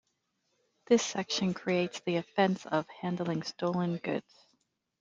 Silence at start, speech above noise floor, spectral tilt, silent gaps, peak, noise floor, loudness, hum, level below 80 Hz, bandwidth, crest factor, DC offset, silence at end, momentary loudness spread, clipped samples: 0.9 s; 48 dB; -5 dB/octave; none; -12 dBFS; -79 dBFS; -32 LUFS; none; -74 dBFS; 7.8 kHz; 22 dB; under 0.1%; 0.8 s; 7 LU; under 0.1%